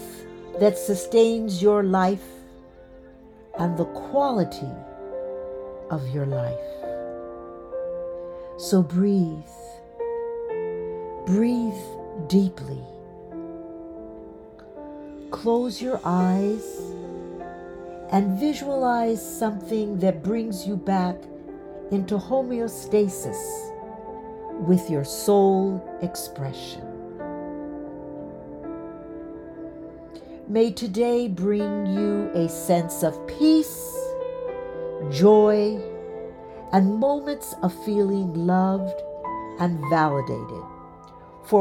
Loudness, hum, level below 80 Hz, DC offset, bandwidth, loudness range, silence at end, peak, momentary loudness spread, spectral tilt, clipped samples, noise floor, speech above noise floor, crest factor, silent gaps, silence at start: -24 LUFS; none; -54 dBFS; under 0.1%; 17.5 kHz; 9 LU; 0 s; -6 dBFS; 18 LU; -6.5 dB/octave; under 0.1%; -47 dBFS; 25 dB; 20 dB; none; 0 s